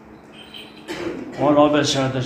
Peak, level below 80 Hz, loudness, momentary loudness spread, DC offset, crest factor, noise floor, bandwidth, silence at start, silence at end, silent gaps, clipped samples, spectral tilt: -2 dBFS; -52 dBFS; -19 LUFS; 22 LU; under 0.1%; 20 dB; -42 dBFS; 14.5 kHz; 0.1 s; 0 s; none; under 0.1%; -5 dB/octave